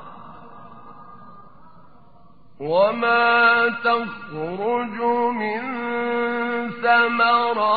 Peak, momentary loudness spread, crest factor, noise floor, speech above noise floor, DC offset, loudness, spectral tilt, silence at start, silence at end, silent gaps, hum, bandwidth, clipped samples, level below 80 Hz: -4 dBFS; 11 LU; 18 dB; -53 dBFS; 33 dB; 0.5%; -20 LUFS; -1.5 dB/octave; 0 s; 0 s; none; none; 4.9 kHz; under 0.1%; -66 dBFS